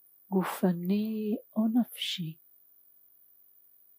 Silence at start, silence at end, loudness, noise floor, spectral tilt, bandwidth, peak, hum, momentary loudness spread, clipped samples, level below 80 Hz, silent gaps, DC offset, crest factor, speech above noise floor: 0.3 s; 1.65 s; -31 LUFS; -61 dBFS; -6 dB/octave; 15.5 kHz; -14 dBFS; none; 7 LU; under 0.1%; -84 dBFS; none; under 0.1%; 18 dB; 31 dB